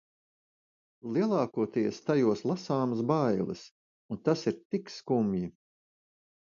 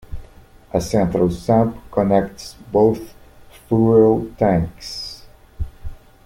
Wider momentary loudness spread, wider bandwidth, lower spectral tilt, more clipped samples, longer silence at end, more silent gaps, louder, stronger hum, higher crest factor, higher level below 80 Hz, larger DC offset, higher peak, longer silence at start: second, 9 LU vs 21 LU; second, 7.4 kHz vs 16 kHz; about the same, -7.5 dB/octave vs -7.5 dB/octave; neither; first, 1.05 s vs 0.3 s; first, 3.71-4.09 s, 4.65-4.70 s vs none; second, -30 LUFS vs -18 LUFS; neither; about the same, 18 dB vs 18 dB; second, -68 dBFS vs -38 dBFS; neither; second, -12 dBFS vs -2 dBFS; first, 1.05 s vs 0.1 s